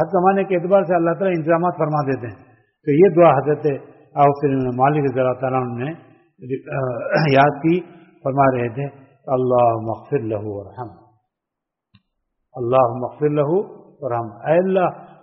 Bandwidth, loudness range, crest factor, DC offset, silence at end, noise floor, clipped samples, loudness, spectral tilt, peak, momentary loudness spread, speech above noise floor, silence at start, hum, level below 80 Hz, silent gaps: 5.8 kHz; 6 LU; 18 dB; under 0.1%; 0.15 s; -83 dBFS; under 0.1%; -19 LUFS; -7 dB/octave; -2 dBFS; 15 LU; 65 dB; 0 s; none; -58 dBFS; none